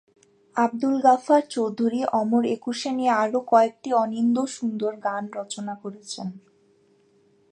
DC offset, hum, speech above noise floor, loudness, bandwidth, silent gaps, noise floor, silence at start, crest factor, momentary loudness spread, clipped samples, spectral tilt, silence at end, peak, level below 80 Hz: under 0.1%; none; 38 dB; -23 LUFS; 10.5 kHz; none; -61 dBFS; 0.55 s; 20 dB; 14 LU; under 0.1%; -5 dB/octave; 1.15 s; -4 dBFS; -78 dBFS